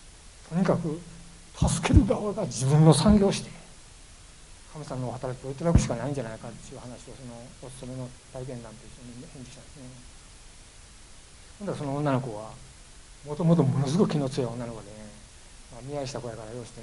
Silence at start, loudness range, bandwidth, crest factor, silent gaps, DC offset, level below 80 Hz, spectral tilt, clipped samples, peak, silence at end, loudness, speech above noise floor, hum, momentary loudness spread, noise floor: 0 s; 18 LU; 11.5 kHz; 24 dB; none; under 0.1%; -40 dBFS; -6.5 dB/octave; under 0.1%; -4 dBFS; 0 s; -26 LUFS; 22 dB; none; 24 LU; -49 dBFS